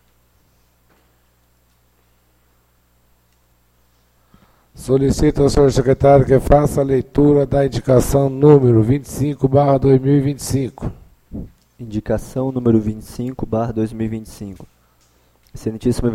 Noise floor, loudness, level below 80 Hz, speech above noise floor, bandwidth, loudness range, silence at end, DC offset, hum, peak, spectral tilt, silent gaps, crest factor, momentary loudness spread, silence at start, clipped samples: -58 dBFS; -16 LUFS; -34 dBFS; 43 dB; 15 kHz; 9 LU; 0 s; under 0.1%; 60 Hz at -40 dBFS; 0 dBFS; -7.5 dB/octave; none; 18 dB; 18 LU; 4.75 s; under 0.1%